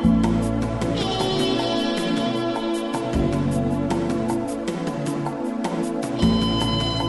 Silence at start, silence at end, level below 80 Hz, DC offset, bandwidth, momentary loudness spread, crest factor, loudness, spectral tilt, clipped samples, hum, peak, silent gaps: 0 s; 0 s; -36 dBFS; under 0.1%; 11.5 kHz; 6 LU; 16 dB; -23 LUFS; -6 dB/octave; under 0.1%; none; -6 dBFS; none